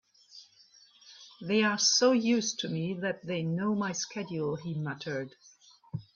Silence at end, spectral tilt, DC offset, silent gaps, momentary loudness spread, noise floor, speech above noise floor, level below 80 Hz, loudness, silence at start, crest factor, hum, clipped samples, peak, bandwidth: 0.15 s; -3.5 dB/octave; under 0.1%; none; 19 LU; -60 dBFS; 31 dB; -72 dBFS; -29 LUFS; 0.35 s; 20 dB; none; under 0.1%; -12 dBFS; 7.6 kHz